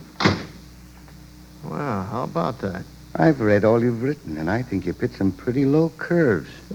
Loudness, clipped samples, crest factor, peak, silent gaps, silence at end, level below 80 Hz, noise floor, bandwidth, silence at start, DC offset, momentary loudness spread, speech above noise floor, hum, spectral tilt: -22 LUFS; under 0.1%; 20 dB; -2 dBFS; none; 0 s; -48 dBFS; -44 dBFS; 19.5 kHz; 0 s; under 0.1%; 12 LU; 23 dB; none; -7.5 dB/octave